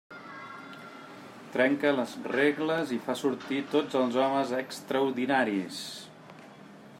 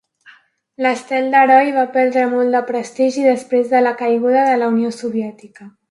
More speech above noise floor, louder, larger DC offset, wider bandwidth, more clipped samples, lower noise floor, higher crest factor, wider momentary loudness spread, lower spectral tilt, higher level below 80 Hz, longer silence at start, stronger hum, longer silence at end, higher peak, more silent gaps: second, 21 dB vs 33 dB; second, -29 LUFS vs -15 LUFS; neither; first, 16 kHz vs 11.5 kHz; neither; about the same, -50 dBFS vs -48 dBFS; about the same, 20 dB vs 16 dB; first, 20 LU vs 10 LU; about the same, -5 dB/octave vs -5 dB/octave; second, -78 dBFS vs -72 dBFS; second, 0.1 s vs 0.8 s; neither; second, 0 s vs 0.2 s; second, -12 dBFS vs 0 dBFS; neither